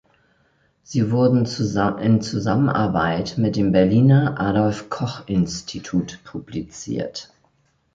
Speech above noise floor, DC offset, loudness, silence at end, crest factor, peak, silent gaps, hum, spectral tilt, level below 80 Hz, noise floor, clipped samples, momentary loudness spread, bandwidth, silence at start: 44 dB; under 0.1%; -20 LUFS; 0.7 s; 16 dB; -4 dBFS; none; none; -7 dB/octave; -48 dBFS; -63 dBFS; under 0.1%; 15 LU; 7.8 kHz; 0.9 s